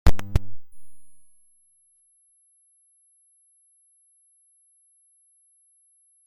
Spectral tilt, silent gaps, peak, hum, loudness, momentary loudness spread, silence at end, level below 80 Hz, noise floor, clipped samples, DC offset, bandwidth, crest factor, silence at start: -6 dB/octave; none; -2 dBFS; none; -28 LUFS; 30 LU; 5.1 s; -34 dBFS; -63 dBFS; under 0.1%; under 0.1%; 16.5 kHz; 22 dB; 0.05 s